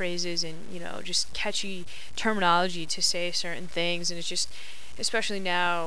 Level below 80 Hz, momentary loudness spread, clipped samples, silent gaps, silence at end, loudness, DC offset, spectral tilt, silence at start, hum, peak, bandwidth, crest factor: -56 dBFS; 14 LU; under 0.1%; none; 0 s; -28 LUFS; 4%; -2 dB/octave; 0 s; none; -10 dBFS; 11 kHz; 20 dB